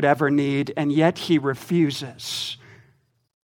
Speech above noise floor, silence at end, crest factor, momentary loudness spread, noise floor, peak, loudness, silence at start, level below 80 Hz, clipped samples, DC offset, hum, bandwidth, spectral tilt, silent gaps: 41 dB; 1 s; 20 dB; 10 LU; -62 dBFS; -4 dBFS; -22 LUFS; 0 s; -68 dBFS; under 0.1%; under 0.1%; none; 18 kHz; -6 dB/octave; none